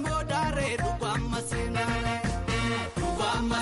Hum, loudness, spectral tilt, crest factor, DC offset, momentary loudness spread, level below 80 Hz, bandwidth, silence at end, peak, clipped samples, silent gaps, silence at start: none; -29 LUFS; -5 dB/octave; 12 dB; under 0.1%; 3 LU; -38 dBFS; 11.5 kHz; 0 s; -18 dBFS; under 0.1%; none; 0 s